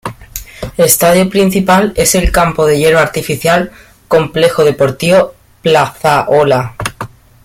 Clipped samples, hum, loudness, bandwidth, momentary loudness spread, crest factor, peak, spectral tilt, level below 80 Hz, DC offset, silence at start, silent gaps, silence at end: under 0.1%; none; -11 LUFS; 17 kHz; 14 LU; 12 dB; 0 dBFS; -4 dB/octave; -28 dBFS; under 0.1%; 0.05 s; none; 0.35 s